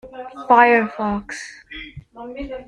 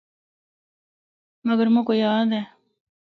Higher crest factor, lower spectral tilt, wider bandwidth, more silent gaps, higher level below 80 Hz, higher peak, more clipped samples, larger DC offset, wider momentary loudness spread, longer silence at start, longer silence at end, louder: about the same, 18 dB vs 16 dB; second, -5 dB/octave vs -8 dB/octave; first, 11 kHz vs 4.9 kHz; neither; first, -48 dBFS vs -76 dBFS; first, -2 dBFS vs -10 dBFS; neither; neither; first, 23 LU vs 11 LU; second, 0.05 s vs 1.45 s; second, 0.05 s vs 0.7 s; first, -16 LUFS vs -21 LUFS